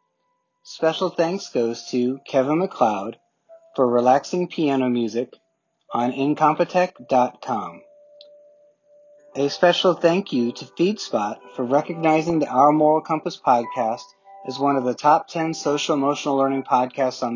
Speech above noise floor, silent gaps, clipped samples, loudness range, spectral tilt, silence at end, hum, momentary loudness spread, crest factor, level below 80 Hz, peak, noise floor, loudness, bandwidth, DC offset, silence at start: 51 dB; none; under 0.1%; 3 LU; -5.5 dB/octave; 0 s; none; 10 LU; 20 dB; -68 dBFS; -2 dBFS; -72 dBFS; -21 LUFS; 7.4 kHz; under 0.1%; 0.65 s